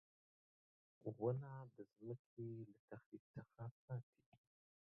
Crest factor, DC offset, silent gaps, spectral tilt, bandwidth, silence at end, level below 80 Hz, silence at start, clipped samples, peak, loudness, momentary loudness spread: 22 dB; under 0.1%; 2.19-2.37 s, 2.79-2.88 s, 3.06-3.12 s, 3.20-3.34 s, 3.71-3.88 s, 4.03-4.13 s, 4.26-4.32 s; -8.5 dB/octave; 2.9 kHz; 0.5 s; -86 dBFS; 1.05 s; under 0.1%; -30 dBFS; -52 LUFS; 15 LU